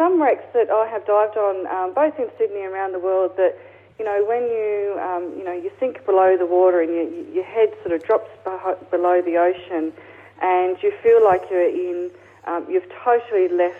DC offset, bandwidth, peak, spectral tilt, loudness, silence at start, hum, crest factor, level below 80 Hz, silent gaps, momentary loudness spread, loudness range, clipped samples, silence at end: under 0.1%; 3.8 kHz; -6 dBFS; -7.5 dB/octave; -20 LUFS; 0 s; none; 14 dB; -68 dBFS; none; 11 LU; 3 LU; under 0.1%; 0 s